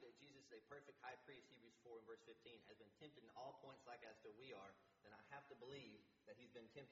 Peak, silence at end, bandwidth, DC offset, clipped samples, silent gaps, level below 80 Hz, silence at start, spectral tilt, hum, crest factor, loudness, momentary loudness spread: -42 dBFS; 0 s; 7.4 kHz; under 0.1%; under 0.1%; none; under -90 dBFS; 0 s; -3 dB/octave; none; 20 dB; -62 LUFS; 8 LU